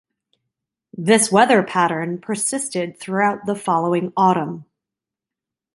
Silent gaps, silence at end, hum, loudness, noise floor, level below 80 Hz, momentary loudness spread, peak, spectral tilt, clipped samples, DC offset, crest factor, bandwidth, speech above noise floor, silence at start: none; 1.15 s; none; -19 LUFS; -87 dBFS; -66 dBFS; 12 LU; -2 dBFS; -4 dB/octave; under 0.1%; under 0.1%; 18 dB; 12 kHz; 68 dB; 0.95 s